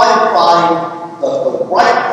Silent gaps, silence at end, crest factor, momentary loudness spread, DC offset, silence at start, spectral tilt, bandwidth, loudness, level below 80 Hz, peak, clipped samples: none; 0 s; 12 dB; 9 LU; under 0.1%; 0 s; -4 dB/octave; 10.5 kHz; -12 LUFS; -58 dBFS; 0 dBFS; under 0.1%